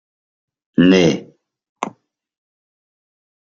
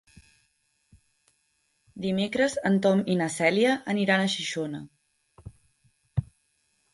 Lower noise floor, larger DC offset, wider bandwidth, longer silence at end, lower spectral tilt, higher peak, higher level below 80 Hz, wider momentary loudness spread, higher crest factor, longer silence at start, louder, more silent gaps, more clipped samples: second, -49 dBFS vs -72 dBFS; neither; second, 7.6 kHz vs 11.5 kHz; first, 1.6 s vs 0.7 s; about the same, -6 dB/octave vs -5 dB/octave; first, -2 dBFS vs -6 dBFS; about the same, -58 dBFS vs -56 dBFS; first, 17 LU vs 11 LU; about the same, 20 dB vs 22 dB; second, 0.8 s vs 1.95 s; first, -15 LUFS vs -26 LUFS; first, 1.69-1.76 s vs none; neither